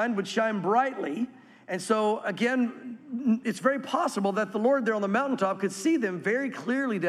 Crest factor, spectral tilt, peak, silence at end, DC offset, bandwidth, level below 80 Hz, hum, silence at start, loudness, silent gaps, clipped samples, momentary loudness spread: 16 dB; -5 dB/octave; -12 dBFS; 0 s; under 0.1%; 14 kHz; -82 dBFS; none; 0 s; -27 LUFS; none; under 0.1%; 7 LU